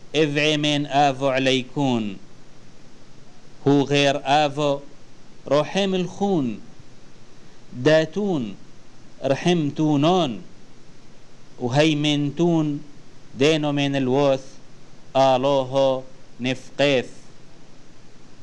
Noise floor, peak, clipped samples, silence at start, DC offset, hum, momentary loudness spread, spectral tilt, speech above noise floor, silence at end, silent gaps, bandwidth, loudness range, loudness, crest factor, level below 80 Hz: -43 dBFS; -6 dBFS; under 0.1%; 0.05 s; 1%; none; 11 LU; -5.5 dB/octave; 22 dB; 0 s; none; 10.5 kHz; 3 LU; -21 LUFS; 18 dB; -50 dBFS